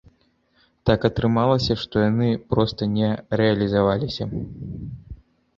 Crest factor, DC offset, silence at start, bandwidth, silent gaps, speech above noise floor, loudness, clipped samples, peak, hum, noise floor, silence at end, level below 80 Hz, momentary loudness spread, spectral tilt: 20 dB; under 0.1%; 0.85 s; 7.4 kHz; none; 42 dB; -22 LUFS; under 0.1%; -2 dBFS; none; -63 dBFS; 0.45 s; -42 dBFS; 14 LU; -8 dB/octave